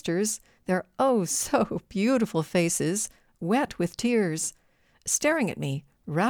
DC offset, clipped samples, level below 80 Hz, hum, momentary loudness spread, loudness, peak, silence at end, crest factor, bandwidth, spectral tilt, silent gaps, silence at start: under 0.1%; under 0.1%; -60 dBFS; none; 9 LU; -27 LUFS; -10 dBFS; 0 s; 16 dB; 20 kHz; -4.5 dB/octave; none; 0.05 s